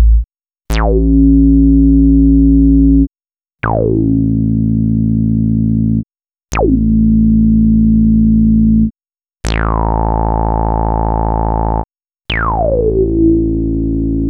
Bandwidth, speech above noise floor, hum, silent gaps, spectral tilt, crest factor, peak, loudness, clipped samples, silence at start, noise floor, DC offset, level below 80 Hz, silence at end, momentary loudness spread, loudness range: 8.6 kHz; over 80 dB; none; none; -8.5 dB/octave; 10 dB; 0 dBFS; -12 LUFS; under 0.1%; 0 s; under -90 dBFS; under 0.1%; -16 dBFS; 0 s; 9 LU; 5 LU